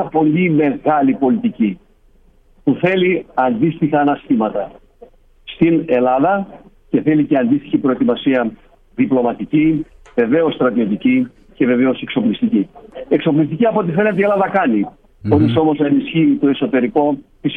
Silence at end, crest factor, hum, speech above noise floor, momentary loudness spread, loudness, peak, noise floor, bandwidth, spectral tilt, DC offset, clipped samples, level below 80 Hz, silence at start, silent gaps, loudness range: 0 s; 14 dB; none; 35 dB; 7 LU; -16 LUFS; -2 dBFS; -50 dBFS; 4.1 kHz; -9.5 dB/octave; under 0.1%; under 0.1%; -50 dBFS; 0 s; none; 2 LU